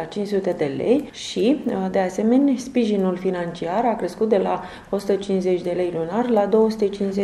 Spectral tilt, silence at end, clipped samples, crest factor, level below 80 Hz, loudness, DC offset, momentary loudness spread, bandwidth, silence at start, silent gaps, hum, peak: -6.5 dB/octave; 0 s; under 0.1%; 16 dB; -54 dBFS; -21 LUFS; under 0.1%; 6 LU; 13 kHz; 0 s; none; none; -6 dBFS